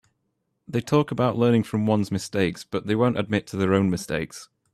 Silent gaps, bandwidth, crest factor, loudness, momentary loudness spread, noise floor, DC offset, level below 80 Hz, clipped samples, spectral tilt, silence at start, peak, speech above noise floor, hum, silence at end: none; 13.5 kHz; 18 dB; -24 LUFS; 9 LU; -75 dBFS; under 0.1%; -56 dBFS; under 0.1%; -6.5 dB/octave; 0.7 s; -6 dBFS; 52 dB; none; 0.3 s